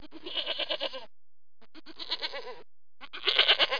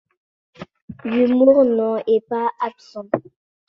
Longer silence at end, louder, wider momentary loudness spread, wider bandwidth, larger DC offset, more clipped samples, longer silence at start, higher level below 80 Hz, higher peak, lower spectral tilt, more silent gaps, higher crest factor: second, 0 s vs 0.5 s; second, -28 LUFS vs -18 LUFS; first, 22 LU vs 16 LU; second, 5.4 kHz vs 6.4 kHz; first, 0.8% vs under 0.1%; neither; second, 0 s vs 0.6 s; second, -70 dBFS vs -62 dBFS; second, -8 dBFS vs -2 dBFS; second, -1.5 dB/octave vs -8 dB/octave; second, none vs 0.82-0.88 s; first, 24 dB vs 18 dB